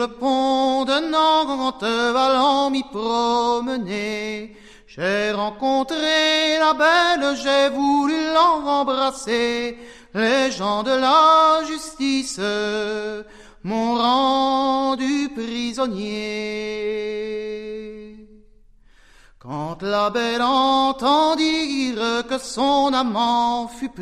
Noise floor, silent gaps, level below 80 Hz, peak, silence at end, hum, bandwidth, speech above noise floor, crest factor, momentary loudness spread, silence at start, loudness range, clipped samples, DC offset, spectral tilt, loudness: -51 dBFS; none; -52 dBFS; -4 dBFS; 0 s; none; 13.5 kHz; 32 dB; 16 dB; 11 LU; 0 s; 9 LU; under 0.1%; 0.1%; -3.5 dB/octave; -20 LUFS